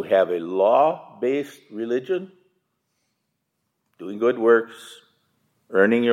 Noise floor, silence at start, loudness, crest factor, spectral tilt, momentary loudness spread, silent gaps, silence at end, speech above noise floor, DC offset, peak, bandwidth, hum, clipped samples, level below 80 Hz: -76 dBFS; 0 s; -21 LUFS; 20 dB; -6 dB/octave; 18 LU; none; 0 s; 55 dB; under 0.1%; -2 dBFS; 13 kHz; none; under 0.1%; -82 dBFS